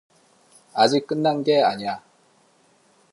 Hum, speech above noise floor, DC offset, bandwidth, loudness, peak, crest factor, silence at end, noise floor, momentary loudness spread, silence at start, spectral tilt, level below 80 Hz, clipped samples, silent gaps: none; 39 dB; under 0.1%; 11.5 kHz; -21 LUFS; -2 dBFS; 22 dB; 1.15 s; -60 dBFS; 12 LU; 0.75 s; -5 dB/octave; -72 dBFS; under 0.1%; none